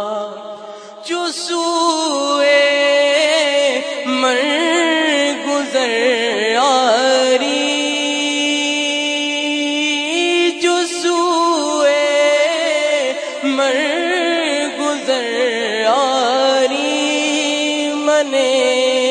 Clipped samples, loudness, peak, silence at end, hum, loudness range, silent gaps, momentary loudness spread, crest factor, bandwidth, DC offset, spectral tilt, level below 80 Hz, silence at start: under 0.1%; -15 LUFS; 0 dBFS; 0 s; none; 2 LU; none; 6 LU; 14 dB; 10.5 kHz; under 0.1%; -0.5 dB/octave; -82 dBFS; 0 s